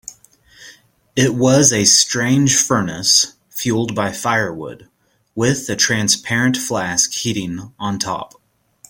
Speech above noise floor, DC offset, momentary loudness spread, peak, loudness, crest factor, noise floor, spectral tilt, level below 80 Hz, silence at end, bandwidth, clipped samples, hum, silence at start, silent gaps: 33 dB; under 0.1%; 14 LU; 0 dBFS; -16 LUFS; 18 dB; -50 dBFS; -3 dB/octave; -52 dBFS; 0.65 s; 17 kHz; under 0.1%; none; 0.1 s; none